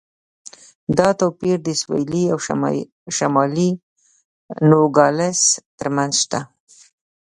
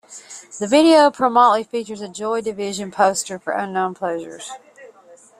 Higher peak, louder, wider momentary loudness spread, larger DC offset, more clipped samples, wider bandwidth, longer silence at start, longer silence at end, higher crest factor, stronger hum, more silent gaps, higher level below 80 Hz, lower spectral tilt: about the same, 0 dBFS vs -2 dBFS; about the same, -18 LUFS vs -18 LUFS; second, 11 LU vs 21 LU; neither; neither; second, 11.5 kHz vs 13.5 kHz; first, 0.9 s vs 0.1 s; first, 0.9 s vs 0.55 s; about the same, 20 dB vs 18 dB; neither; first, 2.92-3.06 s, 3.83-3.96 s, 4.25-4.49 s, 5.66-5.78 s vs none; first, -56 dBFS vs -64 dBFS; about the same, -4.5 dB/octave vs -3.5 dB/octave